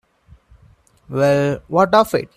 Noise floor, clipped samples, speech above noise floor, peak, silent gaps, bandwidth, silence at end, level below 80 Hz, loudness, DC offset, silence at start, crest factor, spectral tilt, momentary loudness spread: -52 dBFS; under 0.1%; 36 dB; 0 dBFS; none; 15 kHz; 0.1 s; -50 dBFS; -17 LUFS; under 0.1%; 1.1 s; 18 dB; -6.5 dB/octave; 5 LU